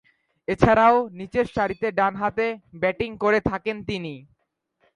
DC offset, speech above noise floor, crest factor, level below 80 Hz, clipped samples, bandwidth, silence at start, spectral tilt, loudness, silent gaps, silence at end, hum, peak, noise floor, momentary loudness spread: under 0.1%; 51 dB; 22 dB; -46 dBFS; under 0.1%; 10.5 kHz; 0.5 s; -7 dB/octave; -23 LUFS; none; 0.75 s; none; -2 dBFS; -73 dBFS; 13 LU